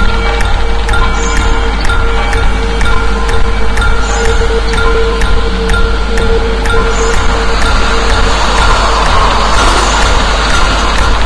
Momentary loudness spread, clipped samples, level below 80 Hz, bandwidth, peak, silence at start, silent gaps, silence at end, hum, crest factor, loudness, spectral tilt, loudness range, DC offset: 4 LU; 0.2%; -12 dBFS; 11 kHz; 0 dBFS; 0 s; none; 0 s; none; 8 dB; -11 LUFS; -4 dB/octave; 3 LU; under 0.1%